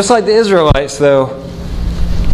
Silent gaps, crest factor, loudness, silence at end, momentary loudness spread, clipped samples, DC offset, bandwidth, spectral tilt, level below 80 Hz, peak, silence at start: none; 10 dB; -12 LUFS; 0 s; 12 LU; 0.2%; under 0.1%; 12.5 kHz; -5 dB/octave; -20 dBFS; 0 dBFS; 0 s